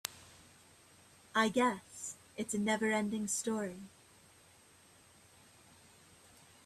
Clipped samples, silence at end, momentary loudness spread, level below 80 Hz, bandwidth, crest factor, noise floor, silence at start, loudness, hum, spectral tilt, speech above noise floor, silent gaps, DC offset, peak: under 0.1%; 2.8 s; 20 LU; -76 dBFS; 15.5 kHz; 26 dB; -63 dBFS; 0.05 s; -35 LUFS; none; -3.5 dB/octave; 29 dB; none; under 0.1%; -12 dBFS